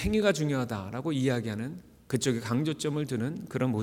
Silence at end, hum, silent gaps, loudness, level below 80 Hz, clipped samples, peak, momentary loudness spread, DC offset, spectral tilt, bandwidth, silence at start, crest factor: 0 s; none; none; -30 LUFS; -50 dBFS; under 0.1%; -12 dBFS; 8 LU; under 0.1%; -5.5 dB/octave; 17.5 kHz; 0 s; 18 dB